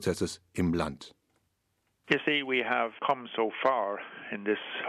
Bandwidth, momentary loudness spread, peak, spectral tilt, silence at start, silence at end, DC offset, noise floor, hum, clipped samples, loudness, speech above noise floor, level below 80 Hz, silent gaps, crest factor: 14 kHz; 10 LU; -8 dBFS; -5 dB/octave; 0 s; 0 s; under 0.1%; -77 dBFS; none; under 0.1%; -30 LUFS; 46 dB; -58 dBFS; none; 22 dB